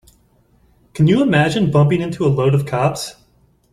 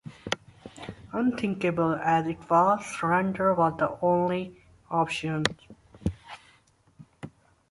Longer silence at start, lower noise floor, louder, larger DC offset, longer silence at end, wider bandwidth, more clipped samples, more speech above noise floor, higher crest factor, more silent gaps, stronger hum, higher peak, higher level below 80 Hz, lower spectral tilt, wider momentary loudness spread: first, 0.95 s vs 0.05 s; second, -56 dBFS vs -62 dBFS; first, -16 LUFS vs -27 LUFS; neither; first, 0.6 s vs 0.4 s; first, 13 kHz vs 11.5 kHz; neither; first, 41 dB vs 36 dB; second, 16 dB vs 24 dB; neither; neither; about the same, -2 dBFS vs -4 dBFS; first, -48 dBFS vs -54 dBFS; about the same, -7 dB/octave vs -6 dB/octave; second, 11 LU vs 22 LU